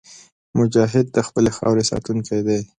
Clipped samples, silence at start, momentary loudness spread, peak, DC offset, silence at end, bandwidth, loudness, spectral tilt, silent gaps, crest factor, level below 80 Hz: under 0.1%; 0.1 s; 6 LU; -2 dBFS; under 0.1%; 0.15 s; 10.5 kHz; -19 LUFS; -6 dB/octave; 0.32-0.53 s; 18 dB; -48 dBFS